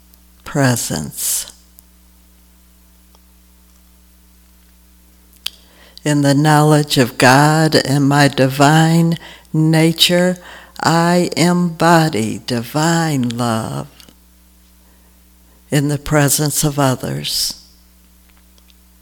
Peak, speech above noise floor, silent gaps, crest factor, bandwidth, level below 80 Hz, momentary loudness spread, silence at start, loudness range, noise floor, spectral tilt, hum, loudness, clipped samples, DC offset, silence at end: 0 dBFS; 34 dB; none; 16 dB; 19.5 kHz; -46 dBFS; 13 LU; 0.45 s; 9 LU; -48 dBFS; -4.5 dB/octave; none; -14 LUFS; under 0.1%; under 0.1%; 1.45 s